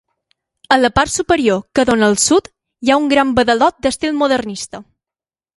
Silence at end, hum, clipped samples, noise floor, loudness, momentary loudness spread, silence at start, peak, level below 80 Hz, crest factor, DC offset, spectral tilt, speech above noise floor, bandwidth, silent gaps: 0.75 s; none; under 0.1%; under -90 dBFS; -14 LUFS; 8 LU; 0.7 s; 0 dBFS; -42 dBFS; 16 dB; under 0.1%; -3.5 dB/octave; over 76 dB; 11.5 kHz; none